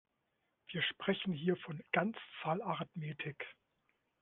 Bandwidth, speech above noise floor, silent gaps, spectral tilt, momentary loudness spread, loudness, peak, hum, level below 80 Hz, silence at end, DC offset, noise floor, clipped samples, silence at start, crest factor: 4.2 kHz; 44 dB; none; -3.5 dB/octave; 8 LU; -39 LUFS; -18 dBFS; none; -80 dBFS; 0.7 s; under 0.1%; -83 dBFS; under 0.1%; 0.7 s; 22 dB